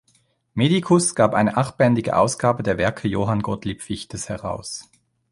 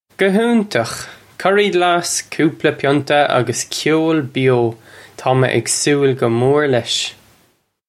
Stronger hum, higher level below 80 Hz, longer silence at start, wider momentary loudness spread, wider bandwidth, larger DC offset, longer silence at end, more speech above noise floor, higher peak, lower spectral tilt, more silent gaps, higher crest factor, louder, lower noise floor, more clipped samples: neither; first, -48 dBFS vs -58 dBFS; first, 0.55 s vs 0.2 s; first, 13 LU vs 6 LU; second, 11.5 kHz vs 15 kHz; neither; second, 0.5 s vs 0.75 s; about the same, 43 dB vs 44 dB; about the same, -2 dBFS vs 0 dBFS; about the same, -5.5 dB/octave vs -4.5 dB/octave; neither; about the same, 20 dB vs 16 dB; second, -21 LUFS vs -16 LUFS; first, -63 dBFS vs -59 dBFS; neither